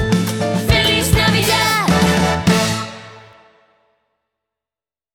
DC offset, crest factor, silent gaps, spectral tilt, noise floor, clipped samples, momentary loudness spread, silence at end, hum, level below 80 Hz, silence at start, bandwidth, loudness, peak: under 0.1%; 16 dB; none; -4.5 dB/octave; under -90 dBFS; under 0.1%; 7 LU; 1.95 s; none; -32 dBFS; 0 s; over 20 kHz; -15 LUFS; 0 dBFS